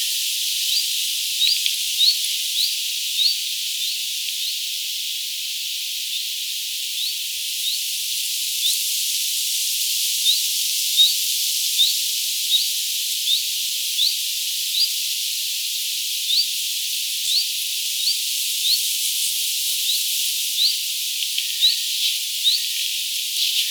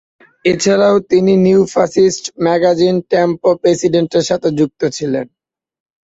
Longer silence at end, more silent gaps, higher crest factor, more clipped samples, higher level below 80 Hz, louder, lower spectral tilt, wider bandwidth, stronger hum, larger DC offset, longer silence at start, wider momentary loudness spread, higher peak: second, 0 s vs 0.8 s; neither; first, 20 dB vs 12 dB; neither; second, under -90 dBFS vs -52 dBFS; second, -19 LUFS vs -13 LUFS; second, 15.5 dB/octave vs -5.5 dB/octave; first, over 20 kHz vs 8 kHz; neither; neither; second, 0 s vs 0.45 s; about the same, 6 LU vs 8 LU; about the same, -2 dBFS vs 0 dBFS